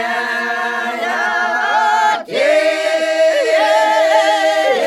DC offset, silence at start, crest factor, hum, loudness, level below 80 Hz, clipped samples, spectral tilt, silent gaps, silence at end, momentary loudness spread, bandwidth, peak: under 0.1%; 0 s; 14 dB; none; -14 LUFS; -70 dBFS; under 0.1%; -1 dB/octave; none; 0 s; 6 LU; 13.5 kHz; 0 dBFS